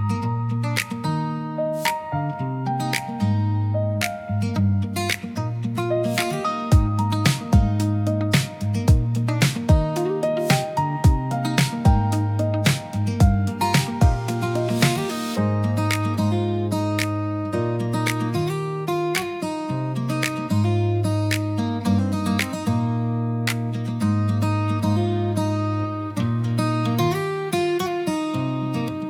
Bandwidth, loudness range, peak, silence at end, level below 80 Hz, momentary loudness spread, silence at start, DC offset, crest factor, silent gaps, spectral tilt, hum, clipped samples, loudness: 17 kHz; 3 LU; -4 dBFS; 0 s; -34 dBFS; 6 LU; 0 s; under 0.1%; 16 dB; none; -6 dB/octave; none; under 0.1%; -22 LUFS